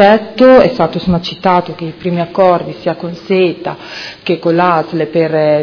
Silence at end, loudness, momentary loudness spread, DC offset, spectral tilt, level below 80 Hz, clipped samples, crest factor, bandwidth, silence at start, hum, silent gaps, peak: 0 s; -12 LUFS; 15 LU; under 0.1%; -7.5 dB/octave; -42 dBFS; 0.7%; 12 dB; 5.4 kHz; 0 s; none; none; 0 dBFS